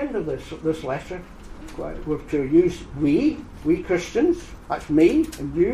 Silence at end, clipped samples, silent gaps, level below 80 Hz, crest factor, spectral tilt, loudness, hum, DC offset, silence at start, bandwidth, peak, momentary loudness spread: 0 s; under 0.1%; none; -42 dBFS; 16 dB; -7 dB/octave; -23 LUFS; none; under 0.1%; 0 s; 12.5 kHz; -6 dBFS; 16 LU